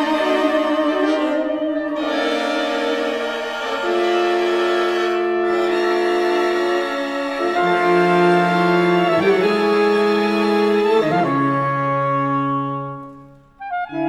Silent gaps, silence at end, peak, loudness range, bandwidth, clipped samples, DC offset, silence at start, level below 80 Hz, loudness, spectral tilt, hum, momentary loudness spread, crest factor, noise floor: none; 0 s; -4 dBFS; 4 LU; 14 kHz; under 0.1%; under 0.1%; 0 s; -58 dBFS; -18 LUFS; -6 dB/octave; none; 7 LU; 14 dB; -43 dBFS